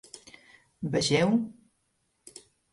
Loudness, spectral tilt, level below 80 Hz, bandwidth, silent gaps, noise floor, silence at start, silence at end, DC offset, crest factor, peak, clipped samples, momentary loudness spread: -27 LUFS; -5 dB/octave; -62 dBFS; 11.5 kHz; none; -75 dBFS; 0.15 s; 1.2 s; under 0.1%; 18 dB; -12 dBFS; under 0.1%; 25 LU